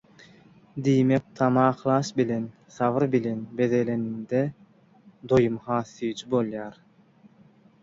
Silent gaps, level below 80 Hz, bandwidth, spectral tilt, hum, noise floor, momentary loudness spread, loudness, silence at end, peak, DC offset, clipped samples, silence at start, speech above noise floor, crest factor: none; -60 dBFS; 7.8 kHz; -7.5 dB/octave; none; -56 dBFS; 10 LU; -25 LUFS; 1.1 s; -8 dBFS; under 0.1%; under 0.1%; 0.75 s; 32 dB; 18 dB